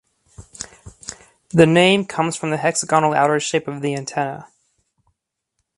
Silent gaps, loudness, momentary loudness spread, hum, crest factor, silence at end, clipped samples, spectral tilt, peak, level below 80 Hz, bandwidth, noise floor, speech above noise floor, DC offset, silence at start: none; -18 LUFS; 21 LU; none; 20 dB; 1.3 s; under 0.1%; -4.5 dB/octave; 0 dBFS; -56 dBFS; 11.5 kHz; -75 dBFS; 58 dB; under 0.1%; 0.4 s